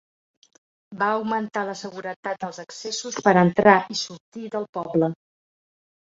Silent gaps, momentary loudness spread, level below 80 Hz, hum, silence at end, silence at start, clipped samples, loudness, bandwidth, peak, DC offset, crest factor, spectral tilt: 2.16-2.23 s, 4.20-4.32 s, 4.69-4.73 s; 16 LU; -64 dBFS; none; 0.95 s; 0.9 s; under 0.1%; -23 LUFS; 7.8 kHz; -2 dBFS; under 0.1%; 22 dB; -5 dB/octave